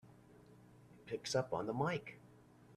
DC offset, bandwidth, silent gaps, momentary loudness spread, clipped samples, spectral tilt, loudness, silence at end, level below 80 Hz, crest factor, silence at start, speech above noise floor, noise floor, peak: under 0.1%; 14 kHz; none; 24 LU; under 0.1%; -5 dB/octave; -40 LUFS; 0 s; -74 dBFS; 20 dB; 0.05 s; 24 dB; -63 dBFS; -22 dBFS